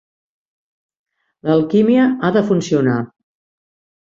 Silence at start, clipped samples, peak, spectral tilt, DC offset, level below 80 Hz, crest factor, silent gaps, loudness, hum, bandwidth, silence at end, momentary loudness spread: 1.45 s; under 0.1%; -2 dBFS; -7 dB/octave; under 0.1%; -58 dBFS; 16 dB; none; -15 LUFS; none; 7.6 kHz; 1 s; 10 LU